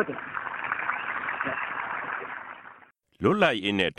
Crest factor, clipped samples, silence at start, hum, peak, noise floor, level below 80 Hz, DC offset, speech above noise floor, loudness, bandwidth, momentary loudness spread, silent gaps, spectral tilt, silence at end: 22 dB; under 0.1%; 0 s; none; -8 dBFS; -55 dBFS; -66 dBFS; under 0.1%; 30 dB; -28 LUFS; 11.5 kHz; 16 LU; none; -5.5 dB/octave; 0.05 s